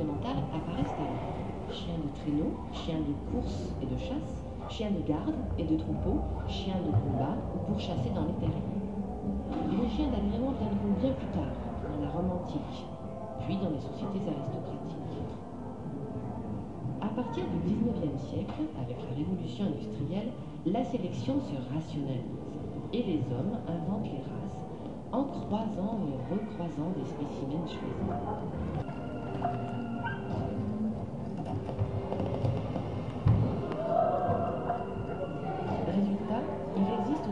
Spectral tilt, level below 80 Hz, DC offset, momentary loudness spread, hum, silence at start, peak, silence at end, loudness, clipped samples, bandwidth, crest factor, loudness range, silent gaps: -8.5 dB/octave; -46 dBFS; 0.3%; 8 LU; none; 0 s; -14 dBFS; 0 s; -34 LUFS; under 0.1%; 10 kHz; 18 dB; 4 LU; none